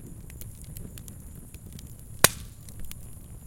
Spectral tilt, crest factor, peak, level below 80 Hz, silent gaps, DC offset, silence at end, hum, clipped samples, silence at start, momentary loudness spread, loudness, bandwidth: -2 dB/octave; 34 dB; 0 dBFS; -46 dBFS; none; under 0.1%; 0 s; none; under 0.1%; 0 s; 23 LU; -22 LUFS; 17 kHz